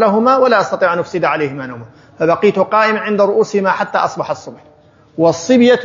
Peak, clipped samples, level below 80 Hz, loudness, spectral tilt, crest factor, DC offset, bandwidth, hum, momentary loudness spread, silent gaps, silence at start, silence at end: 0 dBFS; under 0.1%; -62 dBFS; -14 LUFS; -5.5 dB/octave; 14 dB; under 0.1%; 7.6 kHz; none; 12 LU; none; 0 s; 0 s